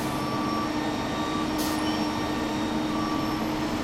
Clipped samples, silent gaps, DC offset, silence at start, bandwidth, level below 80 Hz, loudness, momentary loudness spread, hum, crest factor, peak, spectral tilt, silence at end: under 0.1%; none; under 0.1%; 0 s; 16 kHz; -46 dBFS; -28 LUFS; 2 LU; none; 12 dB; -14 dBFS; -5 dB/octave; 0 s